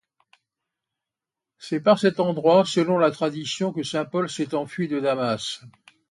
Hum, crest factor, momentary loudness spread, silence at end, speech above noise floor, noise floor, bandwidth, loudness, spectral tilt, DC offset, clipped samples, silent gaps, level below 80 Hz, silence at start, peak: none; 20 dB; 10 LU; 0.4 s; 66 dB; -88 dBFS; 11.5 kHz; -23 LUFS; -5.5 dB/octave; under 0.1%; under 0.1%; none; -70 dBFS; 1.6 s; -6 dBFS